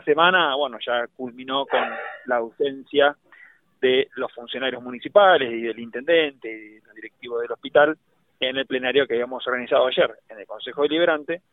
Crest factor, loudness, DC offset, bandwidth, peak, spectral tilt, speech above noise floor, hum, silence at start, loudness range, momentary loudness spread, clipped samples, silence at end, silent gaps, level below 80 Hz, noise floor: 20 dB; -22 LUFS; under 0.1%; 4.1 kHz; -2 dBFS; -7 dB/octave; 30 dB; none; 0.05 s; 3 LU; 17 LU; under 0.1%; 0.15 s; none; -70 dBFS; -52 dBFS